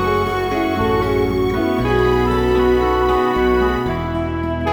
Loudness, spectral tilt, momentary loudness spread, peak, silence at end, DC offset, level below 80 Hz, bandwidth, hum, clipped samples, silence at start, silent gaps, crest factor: -17 LUFS; -7 dB/octave; 6 LU; -4 dBFS; 0 s; under 0.1%; -28 dBFS; over 20 kHz; none; under 0.1%; 0 s; none; 14 dB